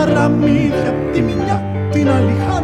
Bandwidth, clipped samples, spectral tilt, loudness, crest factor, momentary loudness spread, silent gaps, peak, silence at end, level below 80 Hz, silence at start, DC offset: 10 kHz; under 0.1%; -7.5 dB/octave; -15 LUFS; 12 dB; 5 LU; none; -2 dBFS; 0 s; -34 dBFS; 0 s; under 0.1%